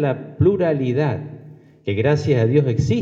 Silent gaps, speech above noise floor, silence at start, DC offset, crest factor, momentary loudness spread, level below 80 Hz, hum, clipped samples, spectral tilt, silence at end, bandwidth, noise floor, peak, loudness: none; 24 dB; 0 s; under 0.1%; 16 dB; 11 LU; -46 dBFS; none; under 0.1%; -8 dB/octave; 0 s; 7.6 kHz; -42 dBFS; -4 dBFS; -19 LUFS